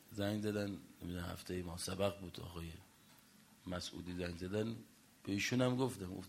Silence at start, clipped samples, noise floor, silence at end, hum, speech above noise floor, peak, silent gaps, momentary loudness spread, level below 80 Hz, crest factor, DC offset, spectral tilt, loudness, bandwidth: 0 s; under 0.1%; -65 dBFS; 0 s; none; 24 dB; -20 dBFS; none; 16 LU; -64 dBFS; 22 dB; under 0.1%; -5 dB/octave; -41 LUFS; 16 kHz